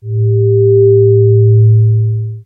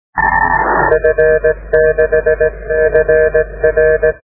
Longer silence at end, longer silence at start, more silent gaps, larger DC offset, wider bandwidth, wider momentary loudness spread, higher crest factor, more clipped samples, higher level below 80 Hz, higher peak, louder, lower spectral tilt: about the same, 0.05 s vs 0.05 s; about the same, 0.05 s vs 0.15 s; neither; second, under 0.1% vs 0.4%; second, 0.5 kHz vs 2.6 kHz; first, 6 LU vs 3 LU; about the same, 8 dB vs 12 dB; neither; second, -42 dBFS vs -28 dBFS; about the same, 0 dBFS vs 0 dBFS; first, -9 LUFS vs -12 LUFS; first, -17 dB/octave vs -11 dB/octave